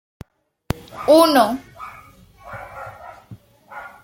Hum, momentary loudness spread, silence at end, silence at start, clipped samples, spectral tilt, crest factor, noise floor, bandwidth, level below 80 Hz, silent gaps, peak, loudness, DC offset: none; 26 LU; 0.15 s; 0.95 s; under 0.1%; -4.5 dB/octave; 20 dB; -46 dBFS; 16.5 kHz; -50 dBFS; none; 0 dBFS; -17 LUFS; under 0.1%